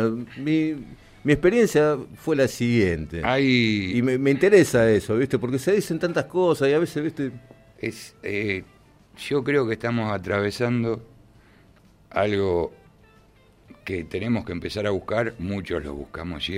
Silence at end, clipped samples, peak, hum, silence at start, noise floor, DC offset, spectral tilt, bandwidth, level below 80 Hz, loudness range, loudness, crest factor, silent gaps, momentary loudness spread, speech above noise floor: 0 s; under 0.1%; -4 dBFS; none; 0 s; -55 dBFS; under 0.1%; -6 dB/octave; 16 kHz; -50 dBFS; 8 LU; -23 LUFS; 20 dB; none; 13 LU; 33 dB